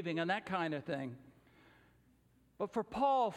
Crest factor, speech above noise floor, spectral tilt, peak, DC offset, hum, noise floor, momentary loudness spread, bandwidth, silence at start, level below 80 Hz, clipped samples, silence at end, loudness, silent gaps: 18 dB; 34 dB; -6.5 dB/octave; -20 dBFS; under 0.1%; none; -70 dBFS; 12 LU; 11.5 kHz; 0 s; -72 dBFS; under 0.1%; 0 s; -37 LUFS; none